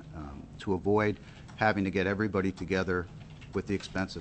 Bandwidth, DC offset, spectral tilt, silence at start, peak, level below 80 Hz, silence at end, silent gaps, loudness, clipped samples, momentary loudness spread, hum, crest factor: 8.6 kHz; under 0.1%; -6.5 dB/octave; 0 s; -12 dBFS; -52 dBFS; 0 s; none; -31 LUFS; under 0.1%; 16 LU; none; 20 dB